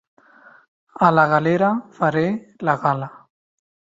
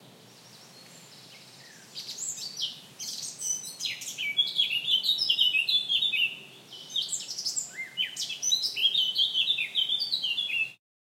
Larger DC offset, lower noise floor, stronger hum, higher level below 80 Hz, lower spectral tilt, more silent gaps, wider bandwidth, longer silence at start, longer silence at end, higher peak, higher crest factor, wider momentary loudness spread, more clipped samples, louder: neither; about the same, -50 dBFS vs -53 dBFS; neither; first, -62 dBFS vs under -90 dBFS; first, -8 dB/octave vs 2 dB/octave; neither; second, 7.8 kHz vs 16.5 kHz; first, 1 s vs 0 s; first, 0.8 s vs 0.25 s; first, -2 dBFS vs -12 dBFS; about the same, 20 dB vs 18 dB; second, 9 LU vs 12 LU; neither; first, -19 LUFS vs -26 LUFS